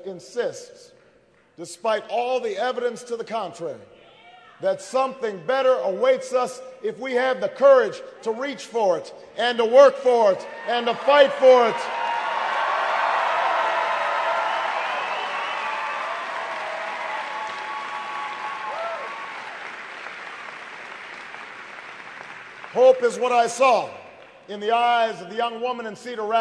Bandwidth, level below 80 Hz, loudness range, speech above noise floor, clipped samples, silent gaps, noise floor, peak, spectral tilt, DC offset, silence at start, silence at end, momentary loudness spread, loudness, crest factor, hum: 11 kHz; -76 dBFS; 13 LU; 36 dB; under 0.1%; none; -58 dBFS; -2 dBFS; -3 dB/octave; under 0.1%; 0 s; 0 s; 19 LU; -22 LUFS; 22 dB; none